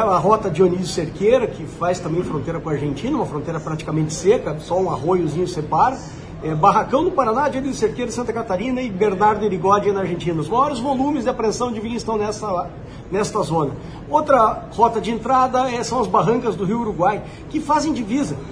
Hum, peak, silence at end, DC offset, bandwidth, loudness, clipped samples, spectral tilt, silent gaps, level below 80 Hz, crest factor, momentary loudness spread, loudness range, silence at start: none; -2 dBFS; 0 s; under 0.1%; 10.5 kHz; -20 LUFS; under 0.1%; -6 dB/octave; none; -42 dBFS; 18 dB; 8 LU; 3 LU; 0 s